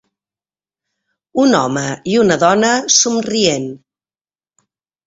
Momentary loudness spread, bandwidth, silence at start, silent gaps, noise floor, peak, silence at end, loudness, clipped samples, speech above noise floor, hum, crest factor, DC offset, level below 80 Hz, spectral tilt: 10 LU; 8 kHz; 1.35 s; none; under -90 dBFS; 0 dBFS; 1.3 s; -14 LUFS; under 0.1%; over 76 dB; none; 16 dB; under 0.1%; -56 dBFS; -3 dB/octave